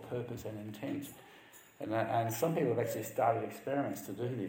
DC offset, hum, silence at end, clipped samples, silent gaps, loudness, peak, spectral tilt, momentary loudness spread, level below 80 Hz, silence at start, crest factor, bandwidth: under 0.1%; none; 0 s; under 0.1%; none; -36 LUFS; -18 dBFS; -6 dB/octave; 14 LU; -72 dBFS; 0 s; 18 dB; 16.5 kHz